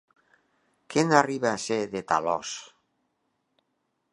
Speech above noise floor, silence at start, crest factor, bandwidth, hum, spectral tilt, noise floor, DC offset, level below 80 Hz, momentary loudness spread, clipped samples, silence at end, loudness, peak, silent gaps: 51 dB; 0.9 s; 26 dB; 11 kHz; none; -4.5 dB/octave; -77 dBFS; under 0.1%; -70 dBFS; 10 LU; under 0.1%; 1.45 s; -26 LUFS; -2 dBFS; none